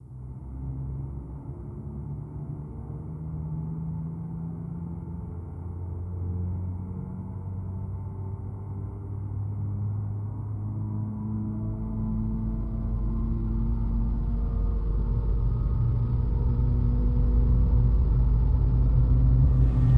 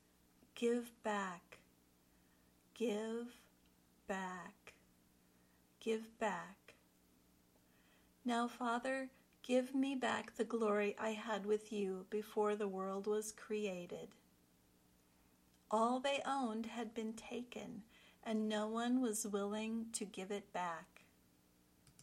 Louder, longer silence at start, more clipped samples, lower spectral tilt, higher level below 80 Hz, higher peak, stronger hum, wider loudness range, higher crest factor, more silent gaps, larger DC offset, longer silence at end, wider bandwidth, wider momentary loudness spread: first, -29 LUFS vs -41 LUFS; second, 0 s vs 0.55 s; neither; first, -12 dB/octave vs -4 dB/octave; first, -28 dBFS vs -80 dBFS; first, -10 dBFS vs -24 dBFS; second, none vs 60 Hz at -80 dBFS; first, 11 LU vs 8 LU; about the same, 16 dB vs 20 dB; neither; neither; about the same, 0 s vs 0 s; second, 2 kHz vs 16.5 kHz; about the same, 14 LU vs 14 LU